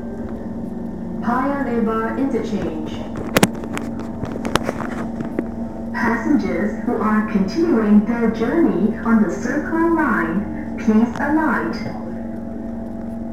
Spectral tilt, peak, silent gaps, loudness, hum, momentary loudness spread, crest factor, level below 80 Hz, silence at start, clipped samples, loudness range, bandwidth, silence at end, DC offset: -6 dB/octave; 0 dBFS; none; -20 LUFS; none; 11 LU; 20 dB; -40 dBFS; 0 s; under 0.1%; 5 LU; 16 kHz; 0 s; 2%